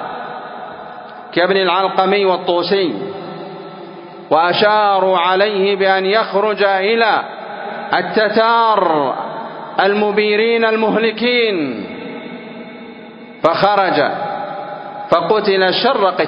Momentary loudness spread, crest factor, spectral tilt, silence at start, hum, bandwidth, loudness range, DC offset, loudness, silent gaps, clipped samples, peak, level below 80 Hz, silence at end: 18 LU; 16 dB; -7 dB/octave; 0 s; none; 5.4 kHz; 4 LU; under 0.1%; -15 LUFS; none; under 0.1%; 0 dBFS; -64 dBFS; 0 s